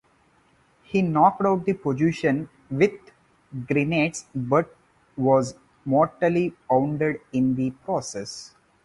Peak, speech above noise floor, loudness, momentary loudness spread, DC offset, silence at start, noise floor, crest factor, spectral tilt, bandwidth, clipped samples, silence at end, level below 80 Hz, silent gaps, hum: -4 dBFS; 39 dB; -24 LUFS; 13 LU; under 0.1%; 0.9 s; -61 dBFS; 20 dB; -6.5 dB/octave; 11.5 kHz; under 0.1%; 0.4 s; -60 dBFS; none; none